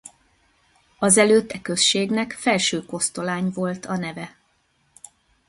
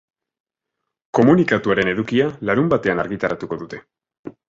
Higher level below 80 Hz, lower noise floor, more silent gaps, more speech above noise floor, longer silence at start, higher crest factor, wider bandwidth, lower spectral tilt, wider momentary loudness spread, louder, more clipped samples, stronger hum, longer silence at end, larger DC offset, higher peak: second, -62 dBFS vs -52 dBFS; second, -65 dBFS vs -80 dBFS; second, none vs 4.19-4.24 s; second, 44 dB vs 62 dB; second, 1 s vs 1.15 s; about the same, 22 dB vs 18 dB; first, 12 kHz vs 7.6 kHz; second, -3 dB/octave vs -7.5 dB/octave; second, 12 LU vs 15 LU; about the same, -21 LUFS vs -19 LUFS; neither; neither; first, 1.2 s vs 0.15 s; neither; about the same, -2 dBFS vs -2 dBFS